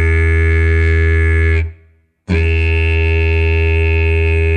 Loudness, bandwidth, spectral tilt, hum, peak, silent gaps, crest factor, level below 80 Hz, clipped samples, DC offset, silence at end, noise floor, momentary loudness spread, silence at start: -14 LUFS; 8.6 kHz; -7.5 dB/octave; none; -2 dBFS; none; 10 dB; -16 dBFS; under 0.1%; 0.9%; 0 s; -50 dBFS; 3 LU; 0 s